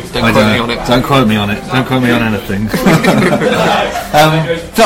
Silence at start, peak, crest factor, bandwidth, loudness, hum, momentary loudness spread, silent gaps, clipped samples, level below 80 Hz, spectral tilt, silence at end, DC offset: 0 s; 0 dBFS; 10 dB; 16.5 kHz; -11 LUFS; none; 6 LU; none; under 0.1%; -32 dBFS; -5.5 dB/octave; 0 s; under 0.1%